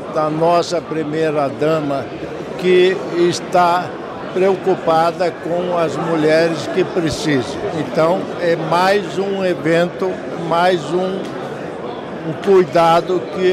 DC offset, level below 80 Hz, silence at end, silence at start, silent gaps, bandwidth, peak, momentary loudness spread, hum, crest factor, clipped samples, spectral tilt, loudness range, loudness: under 0.1%; -52 dBFS; 0 s; 0 s; none; 14 kHz; -4 dBFS; 12 LU; none; 14 dB; under 0.1%; -5.5 dB/octave; 2 LU; -17 LUFS